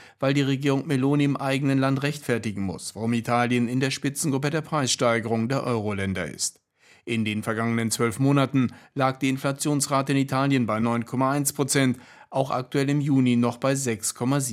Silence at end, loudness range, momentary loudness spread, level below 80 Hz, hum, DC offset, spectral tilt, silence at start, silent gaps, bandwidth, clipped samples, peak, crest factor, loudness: 0 s; 2 LU; 6 LU; -68 dBFS; none; under 0.1%; -5 dB/octave; 0 s; none; 16 kHz; under 0.1%; -6 dBFS; 18 dB; -24 LUFS